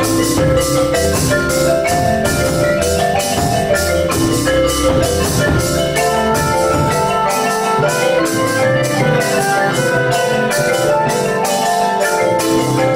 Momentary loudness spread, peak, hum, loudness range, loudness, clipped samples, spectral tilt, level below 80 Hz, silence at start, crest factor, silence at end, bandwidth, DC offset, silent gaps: 1 LU; -2 dBFS; none; 0 LU; -14 LUFS; under 0.1%; -4.5 dB/octave; -32 dBFS; 0 s; 12 dB; 0 s; 16 kHz; under 0.1%; none